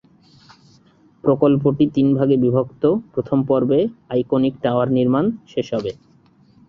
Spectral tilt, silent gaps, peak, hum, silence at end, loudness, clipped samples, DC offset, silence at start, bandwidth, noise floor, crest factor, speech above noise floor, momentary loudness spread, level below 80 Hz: -9.5 dB/octave; none; -2 dBFS; none; 0.75 s; -19 LUFS; under 0.1%; under 0.1%; 1.25 s; 6.4 kHz; -53 dBFS; 18 dB; 35 dB; 8 LU; -54 dBFS